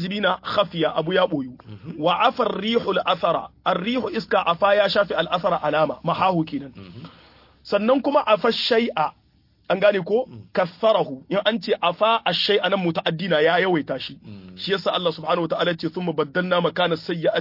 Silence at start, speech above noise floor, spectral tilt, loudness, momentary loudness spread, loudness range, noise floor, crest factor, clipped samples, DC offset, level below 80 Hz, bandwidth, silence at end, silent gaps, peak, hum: 0 s; 38 dB; -6.5 dB/octave; -21 LUFS; 8 LU; 2 LU; -60 dBFS; 18 dB; under 0.1%; under 0.1%; -60 dBFS; 5.8 kHz; 0 s; none; -4 dBFS; none